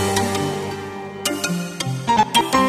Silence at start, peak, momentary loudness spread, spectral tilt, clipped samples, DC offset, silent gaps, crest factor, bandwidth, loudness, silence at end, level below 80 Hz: 0 s; -2 dBFS; 12 LU; -3.5 dB/octave; under 0.1%; under 0.1%; none; 18 dB; 16 kHz; -21 LUFS; 0 s; -50 dBFS